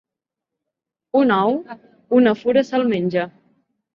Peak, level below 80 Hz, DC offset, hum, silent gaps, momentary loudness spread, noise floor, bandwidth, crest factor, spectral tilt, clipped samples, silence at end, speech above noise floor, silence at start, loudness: -4 dBFS; -64 dBFS; under 0.1%; none; none; 10 LU; -85 dBFS; 7 kHz; 16 dB; -7.5 dB/octave; under 0.1%; 0.65 s; 67 dB; 1.15 s; -18 LUFS